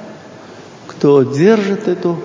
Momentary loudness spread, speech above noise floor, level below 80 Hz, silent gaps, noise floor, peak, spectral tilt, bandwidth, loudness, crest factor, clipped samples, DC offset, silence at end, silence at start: 23 LU; 23 dB; -62 dBFS; none; -36 dBFS; 0 dBFS; -7.5 dB/octave; 7.6 kHz; -13 LUFS; 14 dB; under 0.1%; under 0.1%; 0 s; 0 s